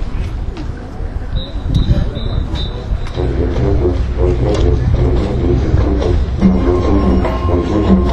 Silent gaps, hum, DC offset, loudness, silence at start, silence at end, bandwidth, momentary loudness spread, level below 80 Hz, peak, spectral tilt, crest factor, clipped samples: none; none; under 0.1%; -16 LUFS; 0 s; 0 s; 8 kHz; 10 LU; -18 dBFS; 0 dBFS; -8.5 dB/octave; 14 dB; under 0.1%